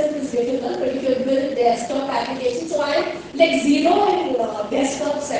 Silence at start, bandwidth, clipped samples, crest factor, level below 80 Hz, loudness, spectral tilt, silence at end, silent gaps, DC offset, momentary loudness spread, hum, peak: 0 s; 9.8 kHz; under 0.1%; 18 dB; -58 dBFS; -20 LUFS; -4 dB/octave; 0 s; none; under 0.1%; 7 LU; none; -2 dBFS